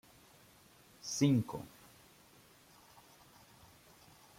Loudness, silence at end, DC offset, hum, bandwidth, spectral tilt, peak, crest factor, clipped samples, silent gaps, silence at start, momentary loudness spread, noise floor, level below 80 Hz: -35 LUFS; 2.7 s; under 0.1%; none; 16.5 kHz; -5.5 dB/octave; -18 dBFS; 24 dB; under 0.1%; none; 1.05 s; 29 LU; -63 dBFS; -74 dBFS